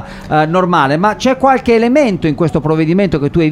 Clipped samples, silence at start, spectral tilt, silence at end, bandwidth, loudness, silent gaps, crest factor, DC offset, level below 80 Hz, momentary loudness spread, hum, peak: under 0.1%; 0 s; -7 dB/octave; 0 s; 11.5 kHz; -12 LUFS; none; 12 dB; under 0.1%; -36 dBFS; 4 LU; none; 0 dBFS